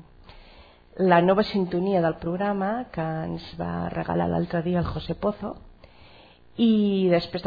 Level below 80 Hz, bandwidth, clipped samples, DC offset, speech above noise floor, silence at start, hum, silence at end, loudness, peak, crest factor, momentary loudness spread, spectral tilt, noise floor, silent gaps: -48 dBFS; 5 kHz; under 0.1%; under 0.1%; 27 dB; 0.3 s; none; 0 s; -25 LUFS; -6 dBFS; 20 dB; 12 LU; -9.5 dB/octave; -51 dBFS; none